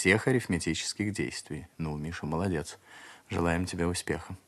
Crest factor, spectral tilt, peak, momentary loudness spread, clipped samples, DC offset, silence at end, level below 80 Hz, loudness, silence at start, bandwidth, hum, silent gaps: 22 dB; -5 dB/octave; -8 dBFS; 14 LU; under 0.1%; under 0.1%; 0.1 s; -52 dBFS; -31 LUFS; 0 s; 13.5 kHz; none; none